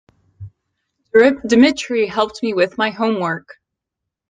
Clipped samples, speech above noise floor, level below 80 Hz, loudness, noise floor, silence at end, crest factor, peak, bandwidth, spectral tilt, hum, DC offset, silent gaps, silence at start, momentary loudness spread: under 0.1%; 66 dB; -56 dBFS; -16 LUFS; -82 dBFS; 0.9 s; 16 dB; -2 dBFS; 9.6 kHz; -5 dB/octave; none; under 0.1%; none; 0.4 s; 7 LU